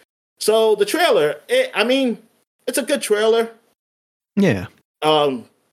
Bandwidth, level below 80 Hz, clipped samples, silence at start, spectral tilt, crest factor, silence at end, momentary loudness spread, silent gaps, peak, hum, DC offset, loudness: 16 kHz; -70 dBFS; under 0.1%; 0.4 s; -4 dB/octave; 18 dB; 0.3 s; 11 LU; 2.47-2.59 s, 3.79-4.21 s, 4.85-4.95 s; -2 dBFS; none; under 0.1%; -18 LUFS